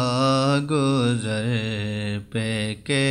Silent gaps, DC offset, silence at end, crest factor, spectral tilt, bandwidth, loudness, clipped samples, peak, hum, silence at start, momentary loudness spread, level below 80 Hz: none; under 0.1%; 0 s; 14 dB; -5.5 dB/octave; 12 kHz; -23 LUFS; under 0.1%; -10 dBFS; none; 0 s; 7 LU; -54 dBFS